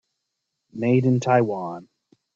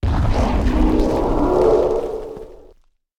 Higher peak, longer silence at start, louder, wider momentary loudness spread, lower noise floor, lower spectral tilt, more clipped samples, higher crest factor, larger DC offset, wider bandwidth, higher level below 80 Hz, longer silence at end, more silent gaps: about the same, -6 dBFS vs -4 dBFS; first, 0.75 s vs 0.05 s; second, -21 LUFS vs -18 LUFS; first, 19 LU vs 14 LU; first, -80 dBFS vs -53 dBFS; about the same, -8 dB/octave vs -8 dB/octave; neither; about the same, 18 dB vs 14 dB; neither; second, 7.2 kHz vs 11.5 kHz; second, -64 dBFS vs -22 dBFS; second, 0.5 s vs 0.65 s; neither